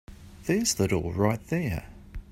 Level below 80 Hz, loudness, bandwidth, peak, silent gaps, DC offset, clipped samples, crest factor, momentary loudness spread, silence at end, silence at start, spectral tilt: -46 dBFS; -28 LUFS; 16 kHz; -8 dBFS; none; under 0.1%; under 0.1%; 22 dB; 14 LU; 0.1 s; 0.1 s; -5 dB/octave